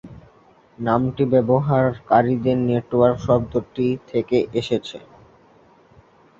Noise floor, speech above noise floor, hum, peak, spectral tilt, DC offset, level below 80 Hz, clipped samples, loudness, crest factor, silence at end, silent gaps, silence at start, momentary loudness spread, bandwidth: -53 dBFS; 34 dB; none; -2 dBFS; -8.5 dB/octave; under 0.1%; -50 dBFS; under 0.1%; -20 LUFS; 18 dB; 1.4 s; none; 0.05 s; 8 LU; 7.6 kHz